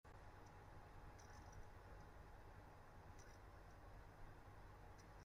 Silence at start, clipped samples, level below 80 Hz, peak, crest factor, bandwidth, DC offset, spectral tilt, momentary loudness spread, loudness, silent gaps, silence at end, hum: 0.05 s; under 0.1%; -66 dBFS; -48 dBFS; 14 dB; 15.5 kHz; under 0.1%; -5.5 dB/octave; 2 LU; -63 LUFS; none; 0 s; none